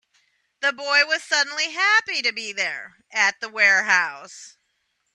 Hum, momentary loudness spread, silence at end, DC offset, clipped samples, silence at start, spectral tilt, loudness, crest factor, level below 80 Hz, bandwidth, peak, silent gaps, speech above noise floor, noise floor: none; 12 LU; 0.65 s; under 0.1%; under 0.1%; 0.6 s; 1 dB/octave; -20 LUFS; 20 dB; -80 dBFS; 11 kHz; -4 dBFS; none; 50 dB; -72 dBFS